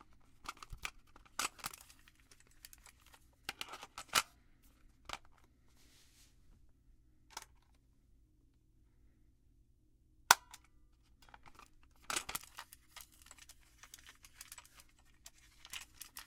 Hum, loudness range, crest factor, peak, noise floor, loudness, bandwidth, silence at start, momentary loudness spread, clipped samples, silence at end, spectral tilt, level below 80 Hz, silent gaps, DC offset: none; 23 LU; 44 dB; -2 dBFS; -70 dBFS; -39 LUFS; 17 kHz; 0.45 s; 25 LU; under 0.1%; 0.05 s; 0.5 dB/octave; -66 dBFS; none; under 0.1%